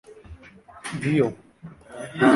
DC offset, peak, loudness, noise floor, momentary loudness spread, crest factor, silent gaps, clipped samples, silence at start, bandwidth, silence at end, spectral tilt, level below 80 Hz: under 0.1%; -4 dBFS; -25 LUFS; -48 dBFS; 24 LU; 20 dB; none; under 0.1%; 0.1 s; 11.5 kHz; 0 s; -6.5 dB/octave; -54 dBFS